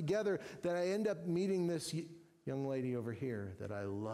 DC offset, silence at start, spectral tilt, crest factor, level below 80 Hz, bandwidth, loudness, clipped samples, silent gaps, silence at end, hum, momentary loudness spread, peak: under 0.1%; 0 s; -6.5 dB/octave; 12 dB; -74 dBFS; 15 kHz; -39 LUFS; under 0.1%; none; 0 s; none; 9 LU; -26 dBFS